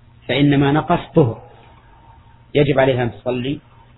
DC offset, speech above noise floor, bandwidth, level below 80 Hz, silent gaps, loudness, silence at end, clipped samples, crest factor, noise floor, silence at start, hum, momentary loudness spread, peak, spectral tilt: under 0.1%; 30 dB; 4.1 kHz; -44 dBFS; none; -17 LUFS; 0.4 s; under 0.1%; 18 dB; -46 dBFS; 0.3 s; none; 10 LU; -2 dBFS; -10.5 dB/octave